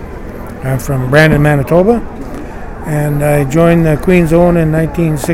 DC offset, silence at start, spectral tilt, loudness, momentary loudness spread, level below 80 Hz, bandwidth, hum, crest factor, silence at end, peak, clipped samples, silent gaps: under 0.1%; 0 s; -7 dB/octave; -11 LUFS; 17 LU; -26 dBFS; 16.5 kHz; none; 10 dB; 0 s; 0 dBFS; 0.2%; none